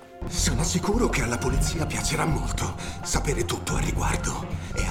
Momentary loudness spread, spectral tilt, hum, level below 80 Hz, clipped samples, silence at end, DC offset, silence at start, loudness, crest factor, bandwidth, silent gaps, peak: 7 LU; -4 dB/octave; none; -32 dBFS; under 0.1%; 0 s; 0.3%; 0 s; -26 LUFS; 18 dB; 16.5 kHz; none; -8 dBFS